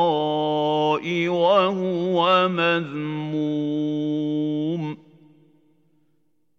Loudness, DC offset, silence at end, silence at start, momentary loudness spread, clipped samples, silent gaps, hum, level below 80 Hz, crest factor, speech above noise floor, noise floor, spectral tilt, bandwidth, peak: -22 LUFS; under 0.1%; 1.6 s; 0 s; 9 LU; under 0.1%; none; none; -84 dBFS; 18 dB; 49 dB; -70 dBFS; -7 dB/octave; 7 kHz; -6 dBFS